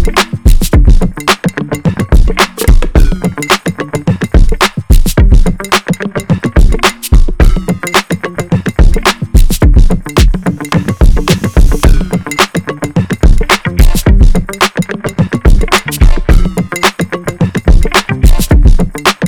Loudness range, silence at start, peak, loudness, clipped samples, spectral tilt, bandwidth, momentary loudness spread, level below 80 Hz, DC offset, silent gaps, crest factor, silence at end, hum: 1 LU; 0 s; 0 dBFS; -11 LUFS; 10%; -5 dB/octave; 19.5 kHz; 6 LU; -10 dBFS; under 0.1%; none; 8 dB; 0 s; none